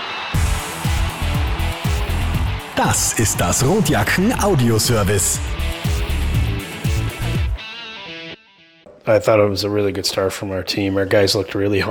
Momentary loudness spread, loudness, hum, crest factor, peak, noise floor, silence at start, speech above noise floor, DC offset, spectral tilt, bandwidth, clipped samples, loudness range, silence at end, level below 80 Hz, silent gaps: 9 LU; -19 LUFS; none; 16 dB; -4 dBFS; -50 dBFS; 0 s; 33 dB; under 0.1%; -4.5 dB/octave; 19 kHz; under 0.1%; 6 LU; 0 s; -26 dBFS; none